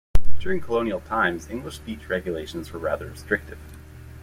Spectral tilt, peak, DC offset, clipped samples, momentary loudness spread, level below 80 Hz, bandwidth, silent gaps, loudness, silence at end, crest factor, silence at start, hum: -6 dB/octave; -2 dBFS; under 0.1%; under 0.1%; 18 LU; -34 dBFS; 14.5 kHz; none; -28 LUFS; 0.6 s; 16 dB; 0.15 s; none